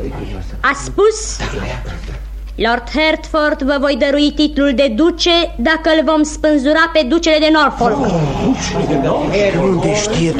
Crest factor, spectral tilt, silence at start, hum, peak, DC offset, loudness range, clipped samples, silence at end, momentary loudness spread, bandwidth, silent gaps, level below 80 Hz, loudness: 14 dB; -4.5 dB/octave; 0 s; none; 0 dBFS; under 0.1%; 4 LU; under 0.1%; 0 s; 12 LU; 11 kHz; none; -28 dBFS; -14 LUFS